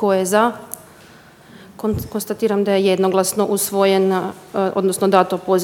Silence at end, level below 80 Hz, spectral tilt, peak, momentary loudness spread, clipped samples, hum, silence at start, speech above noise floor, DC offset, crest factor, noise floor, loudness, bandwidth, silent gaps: 0 s; -50 dBFS; -4.5 dB/octave; 0 dBFS; 10 LU; under 0.1%; none; 0 s; 28 dB; under 0.1%; 18 dB; -45 dBFS; -18 LUFS; 18 kHz; none